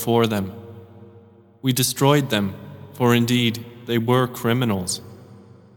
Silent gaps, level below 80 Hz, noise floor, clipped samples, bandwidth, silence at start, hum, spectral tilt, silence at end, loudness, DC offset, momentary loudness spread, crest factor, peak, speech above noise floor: none; -60 dBFS; -49 dBFS; under 0.1%; 19 kHz; 0 s; none; -5 dB/octave; 0.4 s; -21 LUFS; under 0.1%; 15 LU; 20 dB; -2 dBFS; 29 dB